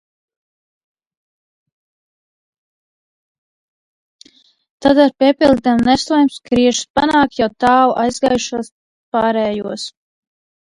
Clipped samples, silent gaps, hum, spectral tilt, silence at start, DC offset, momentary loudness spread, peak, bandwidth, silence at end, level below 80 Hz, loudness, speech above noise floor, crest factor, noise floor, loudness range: under 0.1%; 6.90-6.94 s, 8.72-9.12 s; none; -4 dB/octave; 4.8 s; under 0.1%; 11 LU; 0 dBFS; 11.5 kHz; 0.9 s; -48 dBFS; -15 LUFS; 35 dB; 18 dB; -49 dBFS; 5 LU